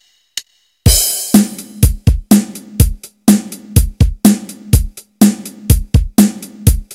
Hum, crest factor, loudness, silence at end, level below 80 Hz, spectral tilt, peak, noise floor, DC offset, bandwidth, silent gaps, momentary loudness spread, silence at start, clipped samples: none; 12 dB; -13 LUFS; 0.1 s; -20 dBFS; -5 dB/octave; 0 dBFS; -31 dBFS; under 0.1%; over 20 kHz; none; 12 LU; 0.35 s; 1%